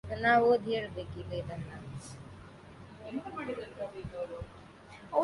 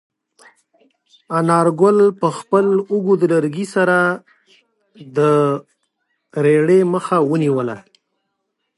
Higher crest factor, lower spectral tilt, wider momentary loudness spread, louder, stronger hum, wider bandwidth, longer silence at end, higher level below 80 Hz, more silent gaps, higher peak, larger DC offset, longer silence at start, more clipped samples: about the same, 20 dB vs 16 dB; about the same, -6 dB/octave vs -7 dB/octave; first, 25 LU vs 11 LU; second, -33 LUFS vs -16 LUFS; neither; about the same, 11.5 kHz vs 11.5 kHz; second, 0 s vs 1 s; first, -56 dBFS vs -70 dBFS; neither; second, -14 dBFS vs -2 dBFS; neither; second, 0.05 s vs 1.3 s; neither